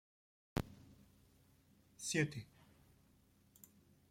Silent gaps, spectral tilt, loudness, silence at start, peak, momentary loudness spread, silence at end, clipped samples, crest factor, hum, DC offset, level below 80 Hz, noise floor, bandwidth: none; -4.5 dB/octave; -42 LUFS; 0.55 s; -22 dBFS; 25 LU; 1.65 s; under 0.1%; 26 dB; none; under 0.1%; -64 dBFS; -71 dBFS; 16.5 kHz